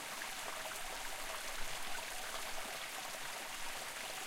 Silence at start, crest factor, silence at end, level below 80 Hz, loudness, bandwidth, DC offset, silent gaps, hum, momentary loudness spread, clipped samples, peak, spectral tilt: 0 s; 16 dB; 0 s; -56 dBFS; -43 LUFS; 16.5 kHz; under 0.1%; none; none; 1 LU; under 0.1%; -26 dBFS; 0 dB/octave